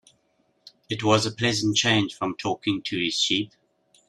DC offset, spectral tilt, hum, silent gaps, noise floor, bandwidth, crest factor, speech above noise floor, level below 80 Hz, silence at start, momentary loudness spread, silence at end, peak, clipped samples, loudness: under 0.1%; -3.5 dB/octave; none; none; -68 dBFS; 12.5 kHz; 20 dB; 44 dB; -60 dBFS; 0.9 s; 8 LU; 0.65 s; -6 dBFS; under 0.1%; -24 LUFS